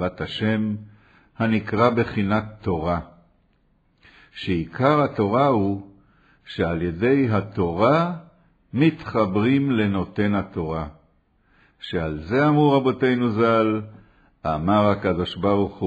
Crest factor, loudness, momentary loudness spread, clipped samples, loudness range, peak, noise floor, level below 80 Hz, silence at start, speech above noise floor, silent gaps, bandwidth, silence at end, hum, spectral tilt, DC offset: 18 dB; -22 LUFS; 10 LU; under 0.1%; 4 LU; -4 dBFS; -63 dBFS; -48 dBFS; 0 s; 42 dB; none; 8 kHz; 0 s; none; -8.5 dB/octave; under 0.1%